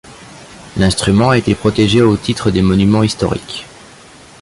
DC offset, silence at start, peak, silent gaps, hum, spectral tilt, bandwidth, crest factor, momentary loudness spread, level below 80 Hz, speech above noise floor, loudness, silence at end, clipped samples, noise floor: under 0.1%; 0.05 s; -2 dBFS; none; none; -6 dB/octave; 11.5 kHz; 14 dB; 11 LU; -34 dBFS; 27 dB; -13 LUFS; 0.75 s; under 0.1%; -39 dBFS